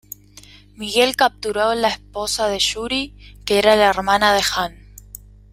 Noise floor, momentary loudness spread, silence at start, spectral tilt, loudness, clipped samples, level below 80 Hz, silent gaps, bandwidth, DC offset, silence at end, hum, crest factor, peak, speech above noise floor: -45 dBFS; 17 LU; 0.8 s; -2.5 dB/octave; -18 LUFS; under 0.1%; -44 dBFS; none; 16 kHz; under 0.1%; 0.35 s; 50 Hz at -40 dBFS; 18 dB; -2 dBFS; 27 dB